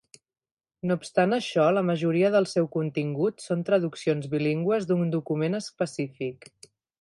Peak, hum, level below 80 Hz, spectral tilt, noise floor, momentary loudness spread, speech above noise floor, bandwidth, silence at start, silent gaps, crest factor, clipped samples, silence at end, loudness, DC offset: -10 dBFS; none; -72 dBFS; -6.5 dB/octave; under -90 dBFS; 8 LU; over 65 dB; 11.5 kHz; 0.85 s; none; 16 dB; under 0.1%; 0.65 s; -26 LUFS; under 0.1%